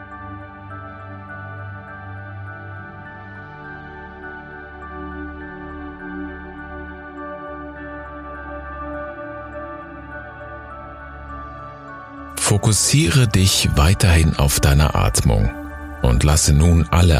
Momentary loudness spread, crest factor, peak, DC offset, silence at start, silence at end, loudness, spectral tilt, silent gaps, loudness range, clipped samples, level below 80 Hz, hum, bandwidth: 20 LU; 20 dB; 0 dBFS; under 0.1%; 0 s; 0 s; -17 LUFS; -4.5 dB/octave; none; 18 LU; under 0.1%; -26 dBFS; none; 15.5 kHz